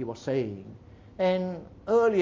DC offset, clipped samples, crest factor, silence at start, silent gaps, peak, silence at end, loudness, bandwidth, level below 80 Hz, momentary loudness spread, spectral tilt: under 0.1%; under 0.1%; 14 dB; 0 s; none; -14 dBFS; 0 s; -28 LUFS; 7.6 kHz; -58 dBFS; 20 LU; -7 dB/octave